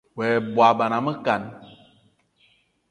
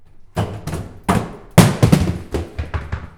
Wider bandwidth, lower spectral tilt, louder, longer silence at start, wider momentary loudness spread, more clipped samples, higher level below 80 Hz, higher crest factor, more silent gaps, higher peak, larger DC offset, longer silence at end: second, 10.5 kHz vs over 20 kHz; about the same, -6.5 dB/octave vs -6 dB/octave; second, -21 LUFS vs -18 LUFS; about the same, 0.15 s vs 0.2 s; second, 8 LU vs 14 LU; neither; second, -66 dBFS vs -32 dBFS; about the same, 22 dB vs 18 dB; neither; about the same, -2 dBFS vs 0 dBFS; neither; first, 1.25 s vs 0.1 s